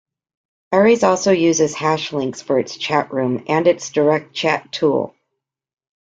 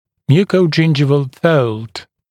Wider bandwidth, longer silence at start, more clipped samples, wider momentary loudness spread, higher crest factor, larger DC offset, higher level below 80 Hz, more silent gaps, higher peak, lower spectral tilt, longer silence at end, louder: second, 9 kHz vs 10 kHz; first, 0.7 s vs 0.3 s; neither; second, 7 LU vs 14 LU; about the same, 16 dB vs 14 dB; neither; about the same, -60 dBFS vs -58 dBFS; neither; about the same, -2 dBFS vs 0 dBFS; second, -4.5 dB/octave vs -7.5 dB/octave; first, 0.9 s vs 0.3 s; second, -18 LUFS vs -14 LUFS